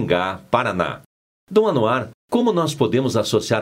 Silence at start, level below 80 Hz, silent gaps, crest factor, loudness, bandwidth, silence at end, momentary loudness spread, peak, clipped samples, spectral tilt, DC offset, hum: 0 s; -54 dBFS; 1.06-1.47 s, 2.14-2.28 s; 20 dB; -20 LUFS; 16 kHz; 0 s; 6 LU; 0 dBFS; under 0.1%; -5.5 dB/octave; under 0.1%; none